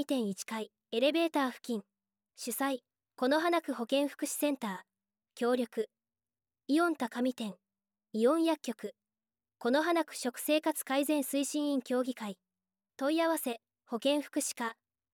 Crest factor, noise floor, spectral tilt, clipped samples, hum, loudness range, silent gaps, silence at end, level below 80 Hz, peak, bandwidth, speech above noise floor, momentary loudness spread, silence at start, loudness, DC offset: 18 dB; under -90 dBFS; -3 dB/octave; under 0.1%; none; 3 LU; none; 0.4 s; under -90 dBFS; -16 dBFS; 18 kHz; over 58 dB; 12 LU; 0 s; -33 LUFS; under 0.1%